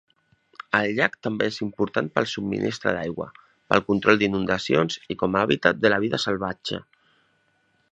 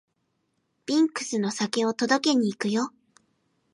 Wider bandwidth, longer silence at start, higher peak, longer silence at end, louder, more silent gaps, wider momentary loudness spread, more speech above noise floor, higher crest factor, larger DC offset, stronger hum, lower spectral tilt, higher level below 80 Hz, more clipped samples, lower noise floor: second, 8.8 kHz vs 11.5 kHz; second, 0.75 s vs 0.9 s; first, 0 dBFS vs -8 dBFS; first, 1.1 s vs 0.85 s; about the same, -23 LUFS vs -25 LUFS; neither; first, 11 LU vs 7 LU; second, 44 dB vs 50 dB; first, 24 dB vs 18 dB; neither; neither; first, -5.5 dB/octave vs -4 dB/octave; first, -56 dBFS vs -78 dBFS; neither; second, -67 dBFS vs -75 dBFS